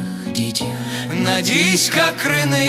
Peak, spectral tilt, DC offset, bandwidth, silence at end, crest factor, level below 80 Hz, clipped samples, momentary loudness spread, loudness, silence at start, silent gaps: -2 dBFS; -3.5 dB/octave; under 0.1%; 16 kHz; 0 s; 16 dB; -54 dBFS; under 0.1%; 10 LU; -17 LUFS; 0 s; none